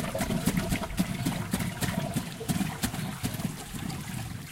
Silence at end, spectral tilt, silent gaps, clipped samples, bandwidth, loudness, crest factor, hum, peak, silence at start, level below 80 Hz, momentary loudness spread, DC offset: 0 s; -5 dB/octave; none; under 0.1%; 17 kHz; -32 LUFS; 18 dB; none; -12 dBFS; 0 s; -46 dBFS; 7 LU; under 0.1%